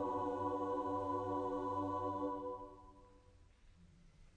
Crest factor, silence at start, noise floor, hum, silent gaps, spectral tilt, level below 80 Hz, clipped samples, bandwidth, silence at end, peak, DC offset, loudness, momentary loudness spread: 14 dB; 0 s; -65 dBFS; none; none; -8 dB/octave; -66 dBFS; under 0.1%; 9.6 kHz; 0.05 s; -28 dBFS; under 0.1%; -41 LUFS; 9 LU